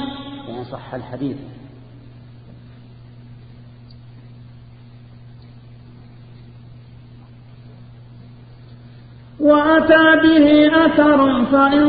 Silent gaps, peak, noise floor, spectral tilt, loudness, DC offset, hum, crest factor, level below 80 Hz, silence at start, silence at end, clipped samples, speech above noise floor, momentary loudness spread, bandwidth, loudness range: none; 0 dBFS; -41 dBFS; -10.5 dB/octave; -13 LUFS; under 0.1%; none; 18 dB; -48 dBFS; 0 s; 0 s; under 0.1%; 28 dB; 20 LU; 5 kHz; 21 LU